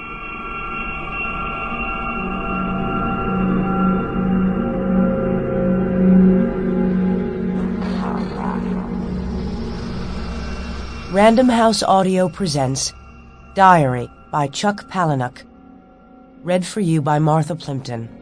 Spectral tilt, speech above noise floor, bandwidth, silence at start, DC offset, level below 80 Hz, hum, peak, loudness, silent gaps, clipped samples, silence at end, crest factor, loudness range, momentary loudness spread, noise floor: -6 dB/octave; 28 dB; 10.5 kHz; 0 s; under 0.1%; -34 dBFS; none; 0 dBFS; -19 LUFS; none; under 0.1%; 0 s; 18 dB; 6 LU; 14 LU; -45 dBFS